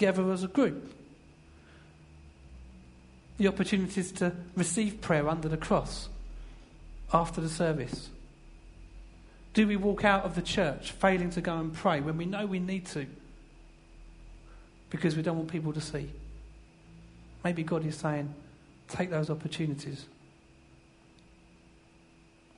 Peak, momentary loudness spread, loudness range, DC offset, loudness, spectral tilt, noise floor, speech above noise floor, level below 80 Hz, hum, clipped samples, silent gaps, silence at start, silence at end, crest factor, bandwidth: -8 dBFS; 23 LU; 7 LU; under 0.1%; -31 LUFS; -5.5 dB/octave; -59 dBFS; 29 dB; -50 dBFS; none; under 0.1%; none; 0 s; 2.5 s; 24 dB; 11 kHz